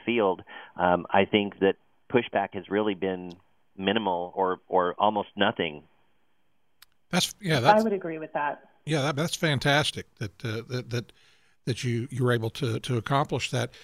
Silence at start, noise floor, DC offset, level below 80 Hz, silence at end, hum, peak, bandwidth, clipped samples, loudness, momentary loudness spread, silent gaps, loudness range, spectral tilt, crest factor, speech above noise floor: 0.05 s; -75 dBFS; under 0.1%; -62 dBFS; 0.05 s; none; -6 dBFS; 15.5 kHz; under 0.1%; -27 LUFS; 12 LU; none; 3 LU; -5 dB/octave; 22 dB; 48 dB